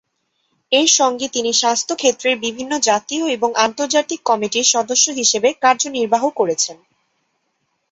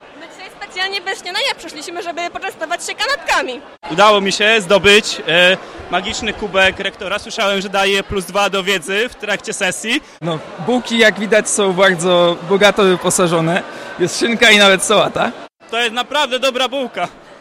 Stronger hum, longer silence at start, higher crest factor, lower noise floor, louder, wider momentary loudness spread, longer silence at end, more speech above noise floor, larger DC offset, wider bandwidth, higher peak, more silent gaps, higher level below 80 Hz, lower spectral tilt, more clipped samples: neither; first, 0.7 s vs 0.05 s; about the same, 18 dB vs 16 dB; first, -69 dBFS vs -35 dBFS; about the same, -16 LUFS vs -14 LUFS; second, 6 LU vs 13 LU; first, 1.2 s vs 0.05 s; first, 52 dB vs 20 dB; neither; second, 8.4 kHz vs 16 kHz; about the same, 0 dBFS vs 0 dBFS; neither; second, -66 dBFS vs -46 dBFS; second, -0.5 dB/octave vs -3 dB/octave; neither